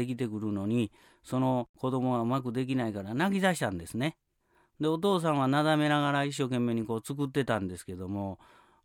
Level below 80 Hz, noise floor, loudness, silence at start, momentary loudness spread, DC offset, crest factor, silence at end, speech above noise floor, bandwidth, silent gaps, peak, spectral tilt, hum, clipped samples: -64 dBFS; -70 dBFS; -30 LUFS; 0 s; 10 LU; under 0.1%; 16 dB; 0.5 s; 40 dB; 17.5 kHz; 1.69-1.74 s; -14 dBFS; -6 dB/octave; none; under 0.1%